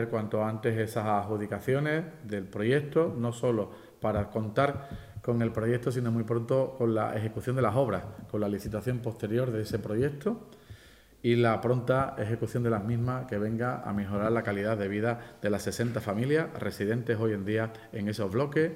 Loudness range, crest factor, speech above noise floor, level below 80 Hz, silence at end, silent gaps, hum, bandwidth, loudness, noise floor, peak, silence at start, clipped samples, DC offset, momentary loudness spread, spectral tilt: 2 LU; 18 dB; 25 dB; -58 dBFS; 0 s; none; none; 15.5 kHz; -30 LUFS; -55 dBFS; -12 dBFS; 0 s; under 0.1%; under 0.1%; 7 LU; -7.5 dB/octave